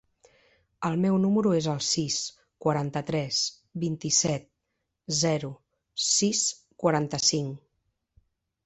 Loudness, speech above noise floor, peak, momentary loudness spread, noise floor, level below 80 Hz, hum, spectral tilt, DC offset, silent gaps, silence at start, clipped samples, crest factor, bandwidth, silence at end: -26 LUFS; 54 dB; -10 dBFS; 11 LU; -81 dBFS; -64 dBFS; none; -3.5 dB/octave; under 0.1%; none; 0.8 s; under 0.1%; 20 dB; 8.4 kHz; 1.1 s